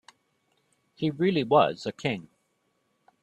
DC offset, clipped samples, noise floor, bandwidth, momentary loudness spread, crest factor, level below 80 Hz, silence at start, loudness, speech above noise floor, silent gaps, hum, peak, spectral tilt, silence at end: under 0.1%; under 0.1%; -73 dBFS; 10 kHz; 10 LU; 22 dB; -68 dBFS; 1 s; -26 LUFS; 48 dB; none; none; -8 dBFS; -6.5 dB/octave; 1 s